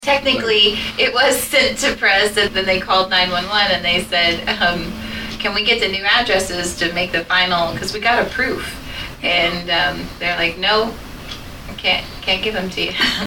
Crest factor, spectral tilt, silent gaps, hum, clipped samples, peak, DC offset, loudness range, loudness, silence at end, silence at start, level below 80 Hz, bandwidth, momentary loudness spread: 16 dB; -2.5 dB/octave; none; none; under 0.1%; -2 dBFS; under 0.1%; 4 LU; -16 LUFS; 0 s; 0 s; -38 dBFS; 19 kHz; 11 LU